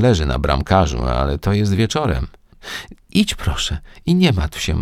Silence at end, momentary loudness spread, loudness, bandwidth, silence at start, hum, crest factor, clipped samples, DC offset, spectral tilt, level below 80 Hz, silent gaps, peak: 0 s; 14 LU; -18 LUFS; 15.5 kHz; 0 s; none; 18 dB; under 0.1%; under 0.1%; -5.5 dB/octave; -26 dBFS; none; 0 dBFS